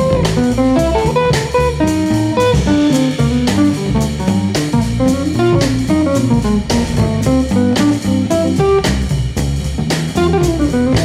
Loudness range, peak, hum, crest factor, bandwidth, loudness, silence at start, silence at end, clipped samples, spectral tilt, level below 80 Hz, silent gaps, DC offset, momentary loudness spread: 1 LU; -2 dBFS; none; 12 dB; 15.5 kHz; -14 LUFS; 0 s; 0 s; under 0.1%; -6 dB/octave; -26 dBFS; none; under 0.1%; 3 LU